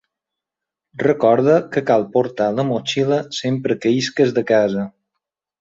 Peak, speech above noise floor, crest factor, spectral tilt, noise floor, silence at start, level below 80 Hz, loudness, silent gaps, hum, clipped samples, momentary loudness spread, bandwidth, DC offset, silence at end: -2 dBFS; 68 dB; 16 dB; -6 dB/octave; -85 dBFS; 0.95 s; -62 dBFS; -18 LUFS; none; none; under 0.1%; 7 LU; 8 kHz; under 0.1%; 0.7 s